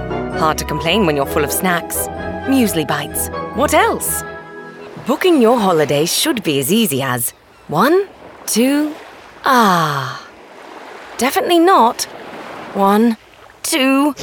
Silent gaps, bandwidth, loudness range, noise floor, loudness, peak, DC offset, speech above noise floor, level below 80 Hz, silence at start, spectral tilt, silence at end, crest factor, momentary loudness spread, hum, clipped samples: none; 19.5 kHz; 2 LU; -37 dBFS; -15 LUFS; -2 dBFS; under 0.1%; 22 dB; -42 dBFS; 0 s; -4 dB/octave; 0 s; 16 dB; 18 LU; none; under 0.1%